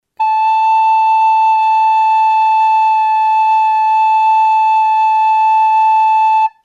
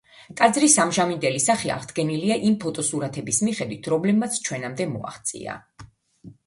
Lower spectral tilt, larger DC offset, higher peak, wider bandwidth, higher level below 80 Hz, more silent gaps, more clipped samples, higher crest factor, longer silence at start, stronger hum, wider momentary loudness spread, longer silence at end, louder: second, 4 dB/octave vs -3.5 dB/octave; neither; second, -6 dBFS vs -2 dBFS; second, 7.4 kHz vs 11.5 kHz; second, -82 dBFS vs -62 dBFS; neither; neither; second, 6 dB vs 22 dB; about the same, 0.2 s vs 0.2 s; neither; second, 2 LU vs 13 LU; about the same, 0.15 s vs 0.15 s; first, -11 LUFS vs -22 LUFS